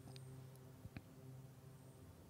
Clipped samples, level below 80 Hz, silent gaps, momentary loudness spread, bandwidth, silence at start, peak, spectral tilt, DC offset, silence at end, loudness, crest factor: under 0.1%; -74 dBFS; none; 5 LU; 16 kHz; 0 s; -36 dBFS; -6 dB/octave; under 0.1%; 0 s; -59 LUFS; 22 dB